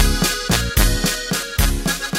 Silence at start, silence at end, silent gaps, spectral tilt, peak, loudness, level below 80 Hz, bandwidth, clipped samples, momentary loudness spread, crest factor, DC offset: 0 s; 0 s; none; -3 dB/octave; 0 dBFS; -19 LUFS; -22 dBFS; 16.5 kHz; under 0.1%; 5 LU; 18 dB; under 0.1%